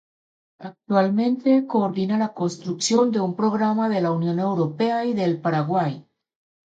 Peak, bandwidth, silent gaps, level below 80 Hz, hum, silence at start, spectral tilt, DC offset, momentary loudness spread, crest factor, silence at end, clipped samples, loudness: -8 dBFS; 9.2 kHz; none; -70 dBFS; none; 0.6 s; -6 dB/octave; under 0.1%; 8 LU; 16 dB; 0.75 s; under 0.1%; -22 LUFS